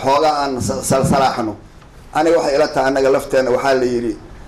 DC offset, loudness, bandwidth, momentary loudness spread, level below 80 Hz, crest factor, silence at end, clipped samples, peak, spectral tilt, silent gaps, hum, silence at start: under 0.1%; -16 LUFS; 15 kHz; 9 LU; -40 dBFS; 8 dB; 0 s; under 0.1%; -8 dBFS; -5 dB/octave; none; none; 0 s